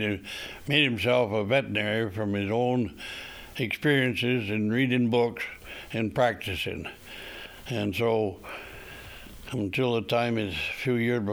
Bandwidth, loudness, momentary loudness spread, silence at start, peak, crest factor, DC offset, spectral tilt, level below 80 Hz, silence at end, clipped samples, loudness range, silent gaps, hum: over 20 kHz; -27 LUFS; 16 LU; 0 s; -8 dBFS; 20 dB; under 0.1%; -6 dB/octave; -54 dBFS; 0 s; under 0.1%; 4 LU; none; none